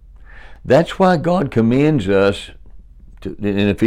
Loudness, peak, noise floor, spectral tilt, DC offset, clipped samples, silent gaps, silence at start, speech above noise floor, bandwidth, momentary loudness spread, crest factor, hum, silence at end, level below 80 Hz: -16 LUFS; -4 dBFS; -39 dBFS; -7.5 dB/octave; under 0.1%; under 0.1%; none; 0.35 s; 24 dB; 12.5 kHz; 18 LU; 14 dB; none; 0 s; -40 dBFS